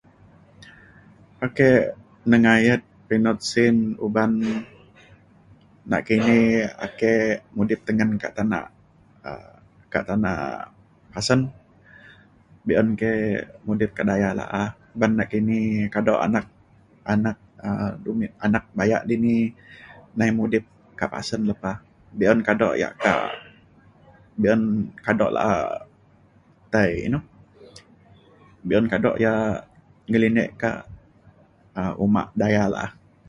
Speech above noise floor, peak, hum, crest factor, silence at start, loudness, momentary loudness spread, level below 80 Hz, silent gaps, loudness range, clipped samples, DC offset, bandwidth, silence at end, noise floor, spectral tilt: 34 dB; -2 dBFS; none; 20 dB; 0.6 s; -22 LUFS; 13 LU; -52 dBFS; none; 5 LU; under 0.1%; under 0.1%; 11 kHz; 0.4 s; -55 dBFS; -6.5 dB/octave